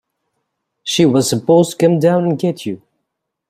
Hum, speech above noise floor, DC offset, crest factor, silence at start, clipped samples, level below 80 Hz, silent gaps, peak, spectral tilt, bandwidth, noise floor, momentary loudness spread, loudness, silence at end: none; 62 dB; under 0.1%; 16 dB; 0.85 s; under 0.1%; -58 dBFS; none; 0 dBFS; -5.5 dB/octave; 16 kHz; -76 dBFS; 14 LU; -14 LUFS; 0.75 s